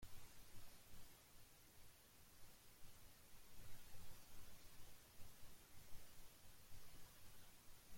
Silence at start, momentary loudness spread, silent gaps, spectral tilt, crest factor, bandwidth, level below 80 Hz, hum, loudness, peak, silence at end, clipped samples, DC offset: 0 s; 3 LU; none; -3 dB/octave; 14 dB; 16.5 kHz; -68 dBFS; none; -66 LUFS; -40 dBFS; 0 s; under 0.1%; under 0.1%